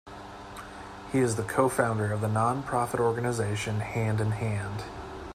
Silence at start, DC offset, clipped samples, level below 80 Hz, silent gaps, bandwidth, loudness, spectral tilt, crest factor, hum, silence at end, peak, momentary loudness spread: 0.05 s; under 0.1%; under 0.1%; -52 dBFS; none; 15.5 kHz; -28 LUFS; -6 dB/octave; 18 dB; none; 0 s; -10 dBFS; 16 LU